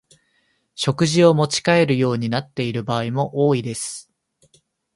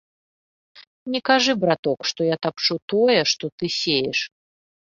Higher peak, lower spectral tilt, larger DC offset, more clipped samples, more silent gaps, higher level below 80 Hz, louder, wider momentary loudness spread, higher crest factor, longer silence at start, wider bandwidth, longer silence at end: about the same, -2 dBFS vs -2 dBFS; first, -5.5 dB/octave vs -3.5 dB/octave; neither; neither; second, none vs 0.87-1.06 s, 1.79-1.83 s, 2.82-2.88 s, 3.52-3.58 s; first, -60 dBFS vs -66 dBFS; about the same, -19 LUFS vs -21 LUFS; first, 12 LU vs 8 LU; about the same, 20 dB vs 20 dB; about the same, 0.8 s vs 0.75 s; first, 11.5 kHz vs 7.6 kHz; first, 0.95 s vs 0.6 s